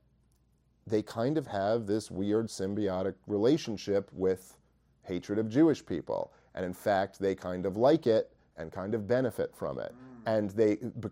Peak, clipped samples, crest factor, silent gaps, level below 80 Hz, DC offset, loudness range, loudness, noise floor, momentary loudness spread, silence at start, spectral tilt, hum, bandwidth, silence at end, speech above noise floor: -14 dBFS; under 0.1%; 18 dB; none; -68 dBFS; under 0.1%; 2 LU; -31 LUFS; -69 dBFS; 13 LU; 0.85 s; -6.5 dB/octave; none; 16 kHz; 0 s; 39 dB